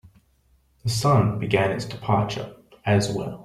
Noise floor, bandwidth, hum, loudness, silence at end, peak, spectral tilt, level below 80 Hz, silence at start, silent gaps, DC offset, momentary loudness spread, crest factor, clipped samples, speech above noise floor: -62 dBFS; 15 kHz; none; -23 LUFS; 0 s; -4 dBFS; -6 dB/octave; -52 dBFS; 0.85 s; none; under 0.1%; 12 LU; 20 dB; under 0.1%; 40 dB